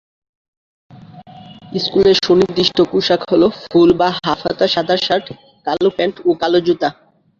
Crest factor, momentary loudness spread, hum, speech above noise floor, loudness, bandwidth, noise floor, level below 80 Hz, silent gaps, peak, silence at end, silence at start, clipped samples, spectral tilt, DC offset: 14 dB; 8 LU; none; 23 dB; -15 LUFS; 7.4 kHz; -38 dBFS; -50 dBFS; none; -2 dBFS; 0.45 s; 0.95 s; under 0.1%; -5.5 dB/octave; under 0.1%